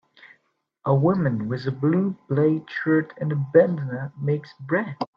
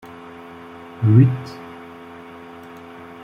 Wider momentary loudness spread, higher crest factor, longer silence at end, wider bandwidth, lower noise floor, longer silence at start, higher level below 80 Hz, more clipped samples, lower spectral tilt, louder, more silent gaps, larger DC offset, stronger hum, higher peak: second, 10 LU vs 25 LU; about the same, 20 dB vs 20 dB; second, 0.1 s vs 1.6 s; about the same, 5.6 kHz vs 5.6 kHz; first, -69 dBFS vs -39 dBFS; second, 0.25 s vs 1 s; second, -64 dBFS vs -58 dBFS; neither; about the same, -10.5 dB/octave vs -9.5 dB/octave; second, -23 LUFS vs -17 LUFS; neither; neither; neither; about the same, -4 dBFS vs -2 dBFS